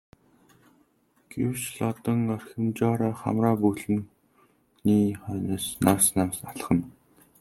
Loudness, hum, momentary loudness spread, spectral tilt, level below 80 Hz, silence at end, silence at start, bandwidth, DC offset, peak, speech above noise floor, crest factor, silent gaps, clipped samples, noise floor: -26 LUFS; none; 9 LU; -5.5 dB/octave; -60 dBFS; 0.5 s; 1.3 s; 16.5 kHz; under 0.1%; -4 dBFS; 40 dB; 22 dB; none; under 0.1%; -66 dBFS